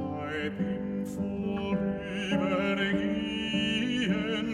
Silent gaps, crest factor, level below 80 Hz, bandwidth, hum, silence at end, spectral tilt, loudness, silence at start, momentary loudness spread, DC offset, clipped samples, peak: none; 14 dB; -54 dBFS; 11.5 kHz; none; 0 s; -6 dB/octave; -30 LUFS; 0 s; 6 LU; under 0.1%; under 0.1%; -16 dBFS